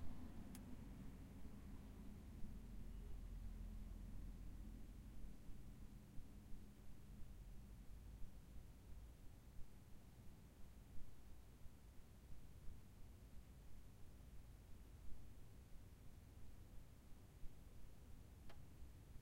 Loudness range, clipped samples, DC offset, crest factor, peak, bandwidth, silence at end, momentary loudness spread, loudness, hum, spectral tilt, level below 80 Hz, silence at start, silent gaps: 6 LU; under 0.1%; under 0.1%; 16 dB; -38 dBFS; 16 kHz; 0 s; 7 LU; -62 LUFS; none; -6.5 dB/octave; -60 dBFS; 0 s; none